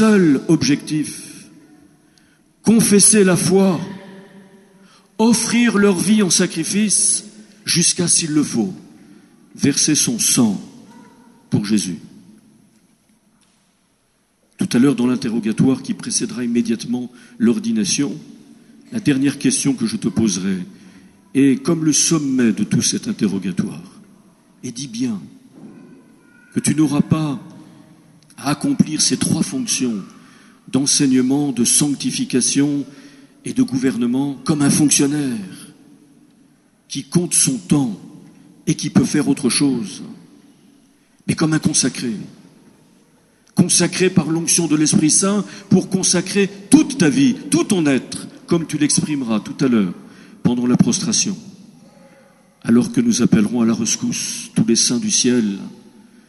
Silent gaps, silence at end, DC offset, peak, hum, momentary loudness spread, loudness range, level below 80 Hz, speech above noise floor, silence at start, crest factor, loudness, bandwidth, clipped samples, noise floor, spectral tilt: none; 0.55 s; under 0.1%; 0 dBFS; none; 13 LU; 7 LU; -58 dBFS; 45 dB; 0 s; 18 dB; -17 LUFS; 13 kHz; under 0.1%; -62 dBFS; -4 dB/octave